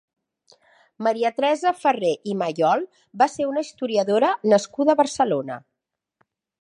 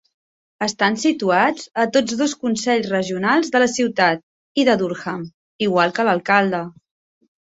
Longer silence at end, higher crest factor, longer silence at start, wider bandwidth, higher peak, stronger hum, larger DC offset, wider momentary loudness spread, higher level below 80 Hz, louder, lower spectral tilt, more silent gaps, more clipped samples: first, 1.05 s vs 0.75 s; about the same, 18 dB vs 18 dB; first, 1 s vs 0.6 s; first, 11 kHz vs 8.2 kHz; about the same, -4 dBFS vs -2 dBFS; neither; neither; second, 7 LU vs 10 LU; second, -72 dBFS vs -62 dBFS; second, -22 LUFS vs -19 LUFS; about the same, -5 dB/octave vs -4 dB/octave; second, none vs 4.23-4.55 s, 5.34-5.59 s; neither